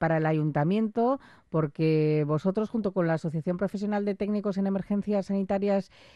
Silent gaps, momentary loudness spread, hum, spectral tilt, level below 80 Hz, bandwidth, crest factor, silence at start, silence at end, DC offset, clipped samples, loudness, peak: none; 5 LU; none; -9 dB/octave; -60 dBFS; 8.4 kHz; 14 dB; 0 s; 0.3 s; under 0.1%; under 0.1%; -28 LUFS; -14 dBFS